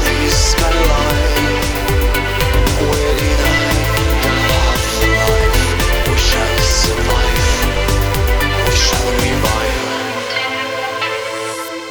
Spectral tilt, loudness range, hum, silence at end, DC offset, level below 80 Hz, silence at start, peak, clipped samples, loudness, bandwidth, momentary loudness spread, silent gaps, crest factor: -4 dB/octave; 2 LU; none; 0 s; under 0.1%; -18 dBFS; 0 s; 0 dBFS; under 0.1%; -15 LUFS; over 20 kHz; 6 LU; none; 14 dB